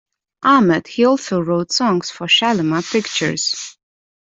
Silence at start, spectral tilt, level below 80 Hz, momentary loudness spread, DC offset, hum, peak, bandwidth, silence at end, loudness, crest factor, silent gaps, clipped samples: 0.4 s; -4 dB/octave; -60 dBFS; 7 LU; under 0.1%; none; -2 dBFS; 8.2 kHz; 0.55 s; -16 LUFS; 16 dB; none; under 0.1%